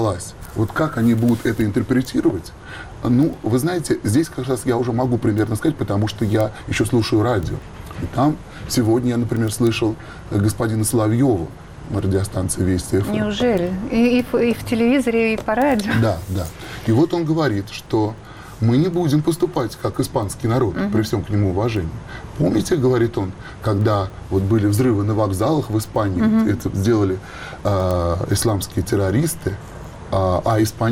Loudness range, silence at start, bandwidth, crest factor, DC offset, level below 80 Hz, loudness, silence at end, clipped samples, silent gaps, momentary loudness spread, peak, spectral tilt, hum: 2 LU; 0 s; 16 kHz; 12 dB; under 0.1%; -40 dBFS; -20 LUFS; 0 s; under 0.1%; none; 9 LU; -8 dBFS; -6.5 dB/octave; none